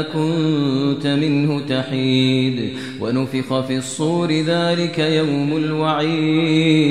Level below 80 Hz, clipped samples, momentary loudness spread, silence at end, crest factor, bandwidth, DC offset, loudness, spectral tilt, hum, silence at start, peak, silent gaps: -58 dBFS; under 0.1%; 5 LU; 0 s; 16 dB; 12 kHz; 0.3%; -18 LUFS; -6 dB/octave; none; 0 s; -2 dBFS; none